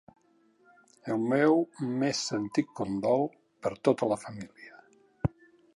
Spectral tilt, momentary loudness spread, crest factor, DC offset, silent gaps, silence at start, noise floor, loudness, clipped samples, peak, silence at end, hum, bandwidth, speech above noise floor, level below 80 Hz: -5.5 dB/octave; 16 LU; 20 dB; under 0.1%; none; 1.05 s; -66 dBFS; -29 LUFS; under 0.1%; -10 dBFS; 0.45 s; none; 11.5 kHz; 37 dB; -58 dBFS